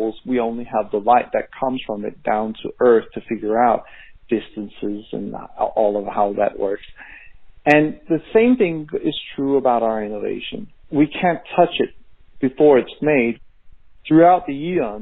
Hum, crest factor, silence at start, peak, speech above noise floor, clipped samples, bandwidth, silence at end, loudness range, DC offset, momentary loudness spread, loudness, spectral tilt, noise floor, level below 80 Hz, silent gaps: none; 20 dB; 0 s; 0 dBFS; 25 dB; under 0.1%; 6 kHz; 0 s; 5 LU; under 0.1%; 14 LU; -19 LUFS; -4.5 dB/octave; -43 dBFS; -50 dBFS; none